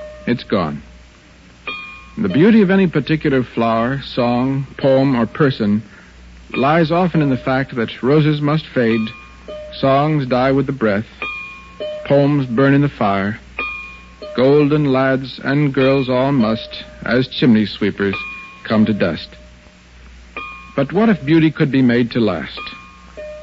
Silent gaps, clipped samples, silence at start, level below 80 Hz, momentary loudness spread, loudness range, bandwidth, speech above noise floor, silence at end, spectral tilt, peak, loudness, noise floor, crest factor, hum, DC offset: none; under 0.1%; 0 s; -44 dBFS; 16 LU; 2 LU; 7.6 kHz; 29 dB; 0 s; -8.5 dB/octave; -2 dBFS; -16 LUFS; -44 dBFS; 14 dB; none; under 0.1%